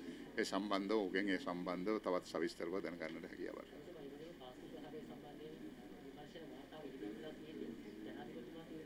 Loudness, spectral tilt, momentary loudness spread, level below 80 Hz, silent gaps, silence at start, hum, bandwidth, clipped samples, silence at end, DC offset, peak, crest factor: -45 LUFS; -5 dB/octave; 15 LU; -72 dBFS; none; 0 s; none; 16.5 kHz; under 0.1%; 0 s; under 0.1%; -22 dBFS; 24 dB